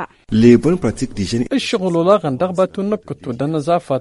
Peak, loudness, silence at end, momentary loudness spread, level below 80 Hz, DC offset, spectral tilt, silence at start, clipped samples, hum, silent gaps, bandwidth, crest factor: 0 dBFS; -16 LUFS; 0 s; 11 LU; -42 dBFS; under 0.1%; -6.5 dB/octave; 0 s; under 0.1%; none; none; 11.5 kHz; 16 dB